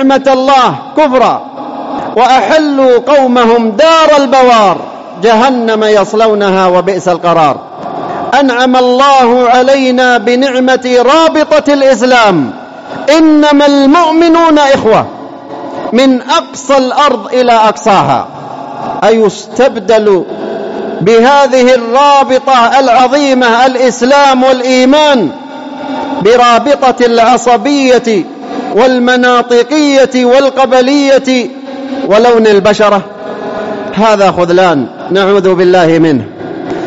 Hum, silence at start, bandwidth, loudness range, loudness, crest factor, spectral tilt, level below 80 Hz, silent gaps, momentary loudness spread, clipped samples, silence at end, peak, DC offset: none; 0 s; 8 kHz; 3 LU; -7 LUFS; 8 dB; -4.5 dB/octave; -48 dBFS; none; 13 LU; 0.5%; 0 s; 0 dBFS; under 0.1%